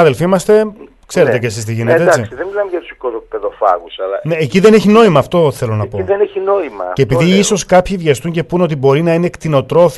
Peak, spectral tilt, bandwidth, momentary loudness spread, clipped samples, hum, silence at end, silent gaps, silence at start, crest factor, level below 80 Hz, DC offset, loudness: 0 dBFS; -6 dB/octave; 12.5 kHz; 12 LU; 0.1%; none; 0 s; none; 0 s; 12 dB; -42 dBFS; under 0.1%; -13 LUFS